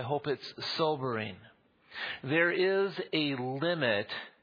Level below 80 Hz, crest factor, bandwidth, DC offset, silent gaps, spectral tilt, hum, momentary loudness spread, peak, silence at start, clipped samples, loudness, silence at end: -78 dBFS; 18 dB; 5.2 kHz; under 0.1%; none; -6.5 dB/octave; none; 11 LU; -14 dBFS; 0 s; under 0.1%; -31 LUFS; 0.15 s